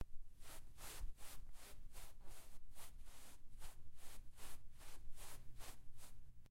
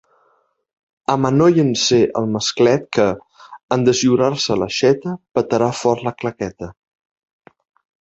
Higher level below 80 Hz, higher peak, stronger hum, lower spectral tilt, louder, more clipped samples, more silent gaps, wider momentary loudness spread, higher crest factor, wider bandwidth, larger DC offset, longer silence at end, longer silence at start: about the same, -56 dBFS vs -52 dBFS; second, -34 dBFS vs -2 dBFS; neither; second, -2.5 dB/octave vs -5 dB/octave; second, -60 LUFS vs -17 LUFS; neither; second, none vs 3.63-3.68 s; second, 8 LU vs 12 LU; about the same, 12 dB vs 16 dB; first, 16 kHz vs 8.2 kHz; neither; second, 0 s vs 1.3 s; second, 0 s vs 1.1 s